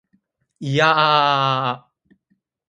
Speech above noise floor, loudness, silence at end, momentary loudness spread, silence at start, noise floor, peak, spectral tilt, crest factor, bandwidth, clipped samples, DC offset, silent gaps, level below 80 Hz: 51 dB; -17 LUFS; 0.9 s; 15 LU; 0.6 s; -69 dBFS; -2 dBFS; -5 dB/octave; 20 dB; 10.5 kHz; under 0.1%; under 0.1%; none; -64 dBFS